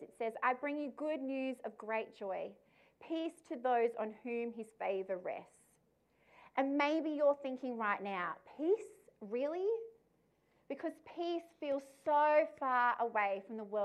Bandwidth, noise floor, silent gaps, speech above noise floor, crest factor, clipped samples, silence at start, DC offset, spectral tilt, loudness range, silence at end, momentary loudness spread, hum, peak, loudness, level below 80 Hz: 12 kHz; -75 dBFS; none; 38 dB; 18 dB; under 0.1%; 0 s; under 0.1%; -5.5 dB/octave; 5 LU; 0 s; 11 LU; none; -20 dBFS; -37 LUFS; -88 dBFS